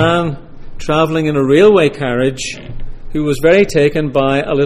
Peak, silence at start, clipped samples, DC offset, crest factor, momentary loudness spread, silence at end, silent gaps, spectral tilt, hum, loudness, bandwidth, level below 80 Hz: 0 dBFS; 0 s; under 0.1%; under 0.1%; 12 dB; 18 LU; 0 s; none; -6 dB/octave; none; -13 LUFS; 14.5 kHz; -30 dBFS